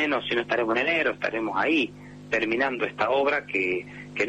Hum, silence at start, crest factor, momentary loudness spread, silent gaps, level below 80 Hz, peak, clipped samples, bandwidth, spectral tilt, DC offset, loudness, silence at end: 50 Hz at -50 dBFS; 0 s; 14 dB; 6 LU; none; -60 dBFS; -12 dBFS; under 0.1%; 8.8 kHz; -5 dB/octave; under 0.1%; -25 LUFS; 0 s